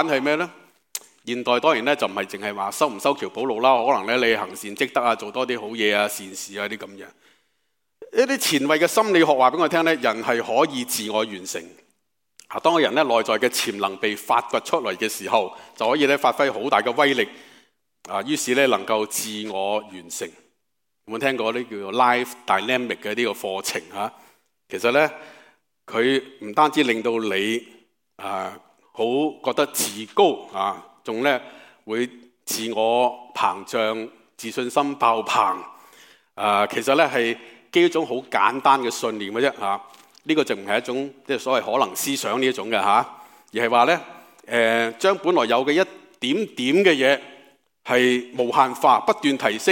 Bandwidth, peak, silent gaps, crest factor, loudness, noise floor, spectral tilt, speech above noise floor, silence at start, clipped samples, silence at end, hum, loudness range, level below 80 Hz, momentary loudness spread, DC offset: 17 kHz; -2 dBFS; none; 20 dB; -22 LUFS; -79 dBFS; -3 dB/octave; 58 dB; 0 s; under 0.1%; 0 s; none; 4 LU; -74 dBFS; 12 LU; under 0.1%